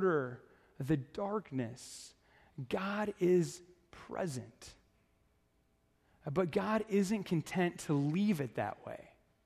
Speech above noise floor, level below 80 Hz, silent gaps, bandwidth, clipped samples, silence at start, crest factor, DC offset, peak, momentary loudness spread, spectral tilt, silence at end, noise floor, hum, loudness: 39 dB; -68 dBFS; none; 14 kHz; under 0.1%; 0 s; 18 dB; under 0.1%; -18 dBFS; 19 LU; -6.5 dB/octave; 0.4 s; -74 dBFS; none; -36 LUFS